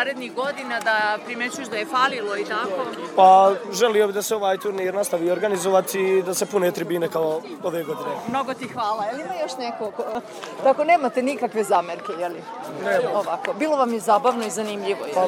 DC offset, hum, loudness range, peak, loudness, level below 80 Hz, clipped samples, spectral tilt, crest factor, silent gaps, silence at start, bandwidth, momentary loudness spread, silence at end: under 0.1%; none; 6 LU; -2 dBFS; -22 LUFS; -74 dBFS; under 0.1%; -3.5 dB/octave; 20 dB; none; 0 s; 18 kHz; 10 LU; 0 s